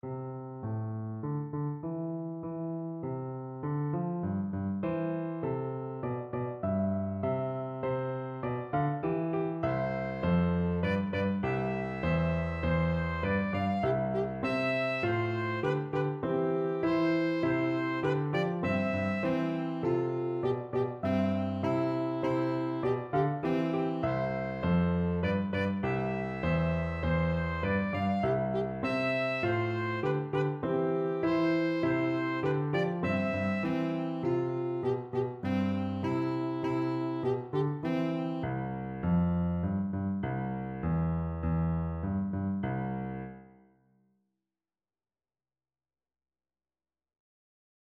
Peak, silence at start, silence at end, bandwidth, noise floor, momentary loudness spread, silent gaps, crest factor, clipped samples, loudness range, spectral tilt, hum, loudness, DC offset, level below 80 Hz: -16 dBFS; 0.05 s; 4.55 s; 7.2 kHz; under -90 dBFS; 7 LU; none; 16 dB; under 0.1%; 5 LU; -9 dB/octave; none; -32 LUFS; under 0.1%; -50 dBFS